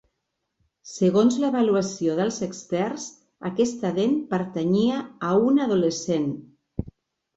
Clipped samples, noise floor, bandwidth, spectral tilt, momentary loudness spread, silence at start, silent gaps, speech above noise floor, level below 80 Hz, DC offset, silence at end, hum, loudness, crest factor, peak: under 0.1%; -79 dBFS; 8 kHz; -6 dB/octave; 16 LU; 0.85 s; none; 56 dB; -54 dBFS; under 0.1%; 0.45 s; none; -23 LUFS; 16 dB; -8 dBFS